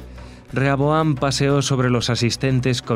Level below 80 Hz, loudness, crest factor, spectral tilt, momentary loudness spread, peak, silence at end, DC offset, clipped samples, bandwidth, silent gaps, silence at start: -42 dBFS; -19 LUFS; 16 dB; -5.5 dB/octave; 4 LU; -4 dBFS; 0 s; under 0.1%; under 0.1%; 13 kHz; none; 0 s